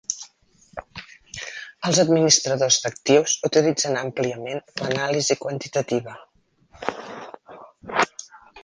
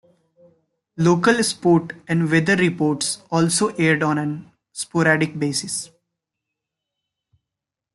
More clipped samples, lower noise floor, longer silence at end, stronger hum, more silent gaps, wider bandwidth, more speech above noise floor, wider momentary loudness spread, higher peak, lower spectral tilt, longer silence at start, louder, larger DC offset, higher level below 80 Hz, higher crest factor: neither; second, -57 dBFS vs -85 dBFS; second, 0.05 s vs 2.1 s; neither; neither; second, 10.5 kHz vs 12 kHz; second, 36 dB vs 66 dB; first, 23 LU vs 11 LU; about the same, -2 dBFS vs -2 dBFS; second, -3 dB/octave vs -4.5 dB/octave; second, 0.1 s vs 0.95 s; about the same, -21 LUFS vs -19 LUFS; neither; about the same, -62 dBFS vs -62 dBFS; about the same, 22 dB vs 18 dB